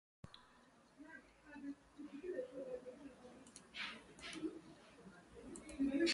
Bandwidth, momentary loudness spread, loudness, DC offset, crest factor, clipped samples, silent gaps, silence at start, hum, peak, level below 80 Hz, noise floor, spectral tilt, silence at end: 11.5 kHz; 15 LU; -49 LUFS; under 0.1%; 22 dB; under 0.1%; none; 0.25 s; none; -26 dBFS; -72 dBFS; -68 dBFS; -3.5 dB/octave; 0 s